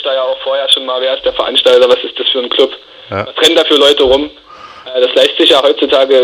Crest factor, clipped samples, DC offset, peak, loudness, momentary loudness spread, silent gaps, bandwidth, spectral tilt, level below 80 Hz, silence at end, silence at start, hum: 10 dB; 0.5%; under 0.1%; 0 dBFS; -10 LUFS; 12 LU; none; 15.5 kHz; -2.5 dB/octave; -44 dBFS; 0 s; 0 s; none